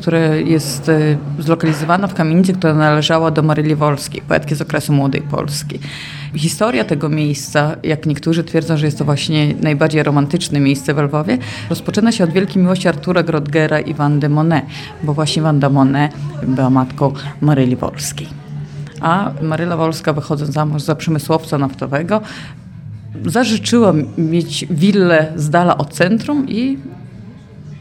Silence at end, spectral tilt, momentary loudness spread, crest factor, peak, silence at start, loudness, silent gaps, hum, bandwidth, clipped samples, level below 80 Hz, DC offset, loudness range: 0 s; -6 dB/octave; 10 LU; 16 dB; 0 dBFS; 0 s; -15 LUFS; none; none; 13.5 kHz; under 0.1%; -46 dBFS; under 0.1%; 4 LU